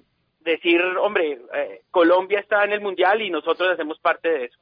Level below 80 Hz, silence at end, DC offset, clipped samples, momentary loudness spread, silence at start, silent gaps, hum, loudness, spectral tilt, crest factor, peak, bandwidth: -72 dBFS; 0.15 s; under 0.1%; under 0.1%; 8 LU; 0.45 s; none; none; -21 LUFS; -6.5 dB/octave; 16 dB; -4 dBFS; 5.2 kHz